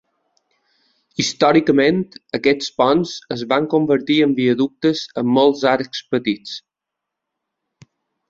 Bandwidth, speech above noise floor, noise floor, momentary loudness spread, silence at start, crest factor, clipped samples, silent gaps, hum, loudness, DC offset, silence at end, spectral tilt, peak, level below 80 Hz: 7.8 kHz; 65 dB; -83 dBFS; 11 LU; 1.2 s; 18 dB; under 0.1%; none; none; -18 LUFS; under 0.1%; 1.7 s; -5 dB/octave; -2 dBFS; -60 dBFS